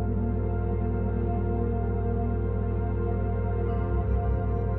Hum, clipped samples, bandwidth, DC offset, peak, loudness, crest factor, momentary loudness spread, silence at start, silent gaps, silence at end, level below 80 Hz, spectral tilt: none; under 0.1%; 3 kHz; under 0.1%; -16 dBFS; -28 LUFS; 10 dB; 1 LU; 0 s; none; 0 s; -30 dBFS; -13 dB/octave